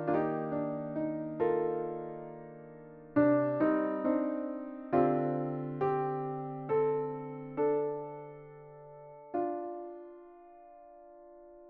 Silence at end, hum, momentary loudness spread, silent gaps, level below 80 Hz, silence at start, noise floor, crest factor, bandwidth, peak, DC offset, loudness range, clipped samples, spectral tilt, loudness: 0 s; none; 22 LU; none; -70 dBFS; 0 s; -54 dBFS; 18 dB; 4.4 kHz; -14 dBFS; under 0.1%; 9 LU; under 0.1%; -8.5 dB/octave; -33 LUFS